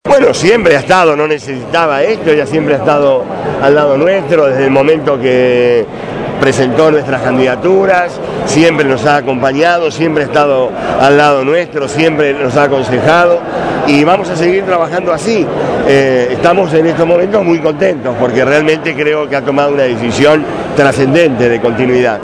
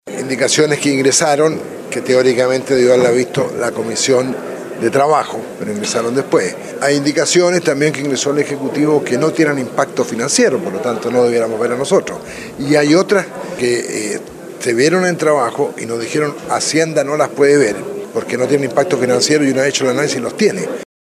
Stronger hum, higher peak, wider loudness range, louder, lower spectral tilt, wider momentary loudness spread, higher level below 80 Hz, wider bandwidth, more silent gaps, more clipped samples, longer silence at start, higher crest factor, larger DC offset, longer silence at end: neither; about the same, 0 dBFS vs 0 dBFS; about the same, 1 LU vs 3 LU; first, -10 LUFS vs -15 LUFS; first, -5.5 dB/octave vs -4 dB/octave; second, 5 LU vs 11 LU; first, -42 dBFS vs -58 dBFS; second, 11 kHz vs 14.5 kHz; neither; first, 1% vs under 0.1%; about the same, 0.05 s vs 0.05 s; about the same, 10 dB vs 14 dB; neither; second, 0 s vs 0.3 s